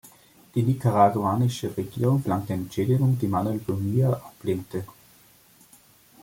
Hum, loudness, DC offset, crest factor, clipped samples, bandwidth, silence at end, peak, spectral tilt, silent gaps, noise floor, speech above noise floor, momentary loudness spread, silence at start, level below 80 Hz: none; -25 LUFS; under 0.1%; 20 dB; under 0.1%; 17 kHz; 1.3 s; -6 dBFS; -8 dB/octave; none; -56 dBFS; 32 dB; 10 LU; 0.55 s; -60 dBFS